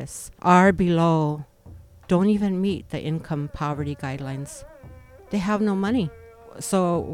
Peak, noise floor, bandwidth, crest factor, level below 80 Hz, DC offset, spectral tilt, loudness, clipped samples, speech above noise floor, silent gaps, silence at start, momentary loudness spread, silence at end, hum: -4 dBFS; -46 dBFS; 15 kHz; 20 dB; -48 dBFS; under 0.1%; -6.5 dB/octave; -23 LUFS; under 0.1%; 24 dB; none; 0 s; 16 LU; 0 s; none